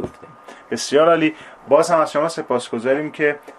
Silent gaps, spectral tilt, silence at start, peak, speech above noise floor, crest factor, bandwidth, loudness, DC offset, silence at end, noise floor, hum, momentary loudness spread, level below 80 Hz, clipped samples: none; -4.5 dB/octave; 0 s; -2 dBFS; 23 dB; 18 dB; 13.5 kHz; -18 LUFS; under 0.1%; 0.05 s; -41 dBFS; none; 12 LU; -60 dBFS; under 0.1%